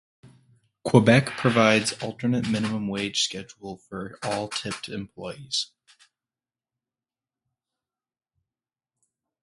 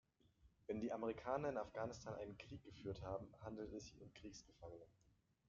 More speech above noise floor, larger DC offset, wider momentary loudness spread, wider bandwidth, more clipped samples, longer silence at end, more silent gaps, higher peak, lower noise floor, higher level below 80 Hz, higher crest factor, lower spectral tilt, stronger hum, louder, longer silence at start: first, over 66 dB vs 25 dB; neither; first, 18 LU vs 15 LU; first, 11.5 kHz vs 7.4 kHz; neither; first, 3.75 s vs 0.6 s; neither; first, -2 dBFS vs -30 dBFS; first, under -90 dBFS vs -75 dBFS; first, -60 dBFS vs -70 dBFS; about the same, 26 dB vs 22 dB; about the same, -5 dB/octave vs -6 dB/octave; neither; first, -24 LUFS vs -50 LUFS; second, 0.25 s vs 0.4 s